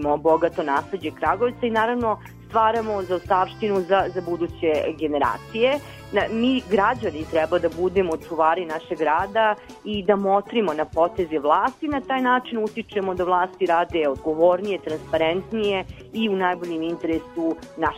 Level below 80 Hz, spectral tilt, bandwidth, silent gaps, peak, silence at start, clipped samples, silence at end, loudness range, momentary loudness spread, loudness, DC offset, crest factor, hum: -48 dBFS; -6 dB/octave; 15.5 kHz; none; -4 dBFS; 0 s; under 0.1%; 0 s; 1 LU; 7 LU; -23 LUFS; under 0.1%; 18 dB; none